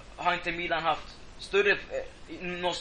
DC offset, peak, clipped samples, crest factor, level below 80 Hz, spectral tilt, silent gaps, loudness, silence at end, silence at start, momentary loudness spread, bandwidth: under 0.1%; -10 dBFS; under 0.1%; 20 dB; -52 dBFS; -3.5 dB/octave; none; -29 LUFS; 0 s; 0 s; 17 LU; 10 kHz